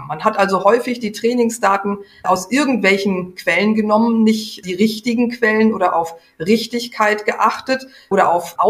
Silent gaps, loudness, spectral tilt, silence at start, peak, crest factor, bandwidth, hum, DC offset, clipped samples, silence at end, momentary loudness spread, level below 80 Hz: none; -17 LUFS; -5 dB/octave; 0 s; 0 dBFS; 16 dB; 15.5 kHz; none; under 0.1%; under 0.1%; 0 s; 8 LU; -60 dBFS